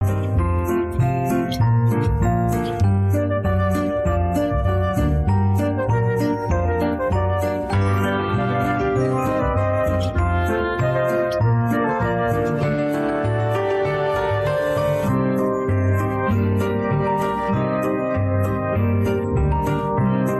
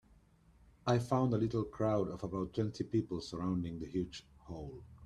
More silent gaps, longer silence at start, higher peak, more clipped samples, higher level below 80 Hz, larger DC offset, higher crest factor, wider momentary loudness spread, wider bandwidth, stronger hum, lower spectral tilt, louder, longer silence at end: neither; second, 0 s vs 0.85 s; first, -10 dBFS vs -16 dBFS; neither; first, -32 dBFS vs -60 dBFS; neither; second, 10 dB vs 20 dB; second, 2 LU vs 15 LU; first, 13 kHz vs 11.5 kHz; neither; about the same, -8 dB/octave vs -7.5 dB/octave; first, -20 LUFS vs -37 LUFS; about the same, 0 s vs 0 s